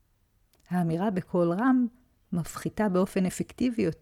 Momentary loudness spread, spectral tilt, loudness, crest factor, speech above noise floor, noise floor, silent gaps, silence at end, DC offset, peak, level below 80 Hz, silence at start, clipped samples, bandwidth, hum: 9 LU; -7 dB/octave; -28 LUFS; 14 dB; 41 dB; -68 dBFS; none; 0.1 s; under 0.1%; -14 dBFS; -56 dBFS; 0.7 s; under 0.1%; 15.5 kHz; none